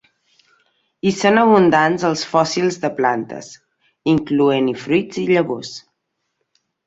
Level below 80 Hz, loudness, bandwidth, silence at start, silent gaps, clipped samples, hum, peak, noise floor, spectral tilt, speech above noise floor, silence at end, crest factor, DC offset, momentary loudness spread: -58 dBFS; -17 LUFS; 8 kHz; 1.05 s; none; under 0.1%; none; -2 dBFS; -74 dBFS; -5.5 dB/octave; 57 dB; 1.1 s; 18 dB; under 0.1%; 14 LU